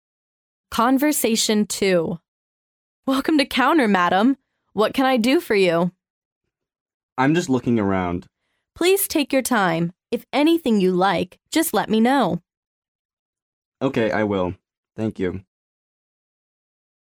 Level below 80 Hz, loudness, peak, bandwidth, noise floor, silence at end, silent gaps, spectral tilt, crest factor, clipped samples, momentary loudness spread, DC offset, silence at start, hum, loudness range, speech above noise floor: -56 dBFS; -20 LUFS; -4 dBFS; over 20 kHz; under -90 dBFS; 1.65 s; 2.28-3.03 s, 6.10-6.41 s, 6.81-6.86 s, 6.94-7.16 s, 12.57-12.82 s, 12.88-13.33 s, 13.42-13.72 s, 14.77-14.83 s; -4.5 dB/octave; 18 dB; under 0.1%; 11 LU; under 0.1%; 0.7 s; none; 7 LU; over 71 dB